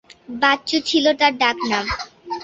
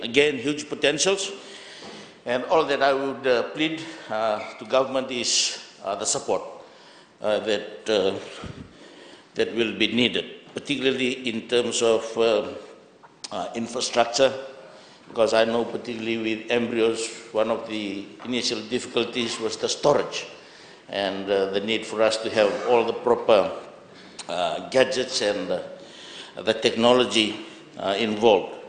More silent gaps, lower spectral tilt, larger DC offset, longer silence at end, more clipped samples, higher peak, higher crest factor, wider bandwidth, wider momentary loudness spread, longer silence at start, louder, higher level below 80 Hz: neither; about the same, -3 dB/octave vs -3 dB/octave; neither; about the same, 0 s vs 0 s; neither; about the same, -2 dBFS vs -2 dBFS; about the same, 18 dB vs 22 dB; second, 8.2 kHz vs 9.8 kHz; second, 12 LU vs 17 LU; first, 0.3 s vs 0 s; first, -18 LUFS vs -24 LUFS; first, -46 dBFS vs -62 dBFS